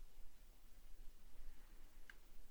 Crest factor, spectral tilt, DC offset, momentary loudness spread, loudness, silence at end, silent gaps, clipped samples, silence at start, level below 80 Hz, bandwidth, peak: 12 dB; -3.5 dB/octave; under 0.1%; 4 LU; -67 LUFS; 0 s; none; under 0.1%; 0 s; -58 dBFS; over 20 kHz; -38 dBFS